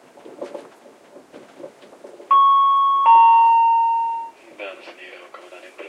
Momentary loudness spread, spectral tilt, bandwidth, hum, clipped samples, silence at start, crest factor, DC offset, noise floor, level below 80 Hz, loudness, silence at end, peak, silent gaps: 25 LU; -2 dB/octave; 7.8 kHz; none; under 0.1%; 0.4 s; 16 dB; under 0.1%; -47 dBFS; -88 dBFS; -14 LUFS; 0 s; -4 dBFS; none